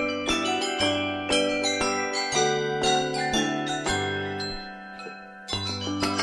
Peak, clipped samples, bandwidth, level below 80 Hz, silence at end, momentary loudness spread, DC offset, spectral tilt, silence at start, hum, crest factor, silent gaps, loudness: -10 dBFS; under 0.1%; 13 kHz; -52 dBFS; 0 s; 13 LU; under 0.1%; -3 dB/octave; 0 s; none; 18 dB; none; -25 LUFS